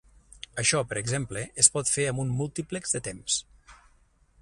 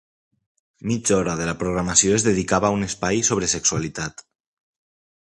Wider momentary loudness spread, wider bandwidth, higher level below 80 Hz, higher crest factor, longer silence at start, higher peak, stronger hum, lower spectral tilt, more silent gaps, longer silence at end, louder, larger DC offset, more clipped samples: about the same, 12 LU vs 11 LU; about the same, 11.5 kHz vs 11.5 kHz; second, -56 dBFS vs -46 dBFS; first, 28 dB vs 22 dB; second, 0.55 s vs 0.85 s; about the same, -2 dBFS vs -2 dBFS; neither; about the same, -2.5 dB/octave vs -3.5 dB/octave; neither; second, 0.65 s vs 1.2 s; second, -26 LUFS vs -20 LUFS; neither; neither